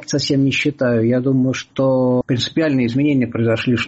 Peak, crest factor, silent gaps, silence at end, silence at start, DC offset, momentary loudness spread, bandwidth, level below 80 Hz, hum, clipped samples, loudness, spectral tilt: -6 dBFS; 10 dB; none; 0 s; 0 s; under 0.1%; 2 LU; 8 kHz; -52 dBFS; none; under 0.1%; -17 LUFS; -6 dB/octave